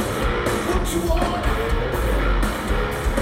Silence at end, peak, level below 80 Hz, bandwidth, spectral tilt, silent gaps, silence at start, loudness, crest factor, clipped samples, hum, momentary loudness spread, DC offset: 0 s; -8 dBFS; -24 dBFS; 16.5 kHz; -5 dB/octave; none; 0 s; -22 LUFS; 14 dB; under 0.1%; none; 2 LU; under 0.1%